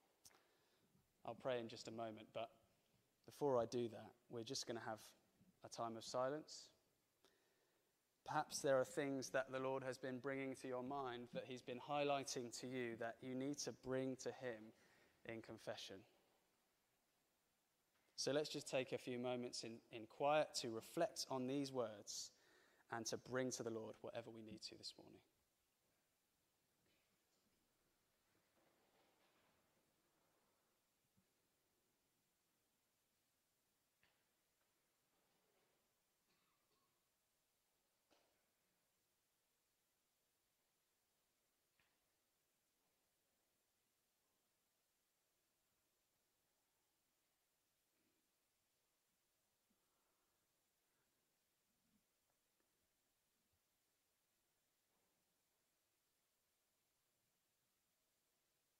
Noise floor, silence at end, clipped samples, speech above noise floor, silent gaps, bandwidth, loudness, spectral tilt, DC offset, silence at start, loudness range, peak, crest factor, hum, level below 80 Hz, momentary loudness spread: -88 dBFS; 33.6 s; under 0.1%; 40 dB; none; 15.5 kHz; -48 LUFS; -4 dB/octave; under 0.1%; 0.25 s; 10 LU; -26 dBFS; 26 dB; none; under -90 dBFS; 14 LU